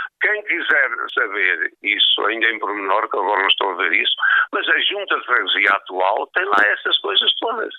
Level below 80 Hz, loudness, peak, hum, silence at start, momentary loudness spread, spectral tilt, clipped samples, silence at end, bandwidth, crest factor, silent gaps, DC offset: -80 dBFS; -17 LUFS; -2 dBFS; none; 0 s; 5 LU; -2 dB/octave; under 0.1%; 0 s; 9.2 kHz; 16 dB; none; under 0.1%